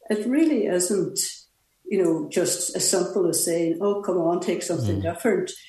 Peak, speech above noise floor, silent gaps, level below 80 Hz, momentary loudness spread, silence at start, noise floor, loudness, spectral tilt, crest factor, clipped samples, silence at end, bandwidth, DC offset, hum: -8 dBFS; 22 dB; none; -66 dBFS; 5 LU; 0.1 s; -45 dBFS; -23 LUFS; -4 dB/octave; 16 dB; under 0.1%; 0 s; 12.5 kHz; under 0.1%; none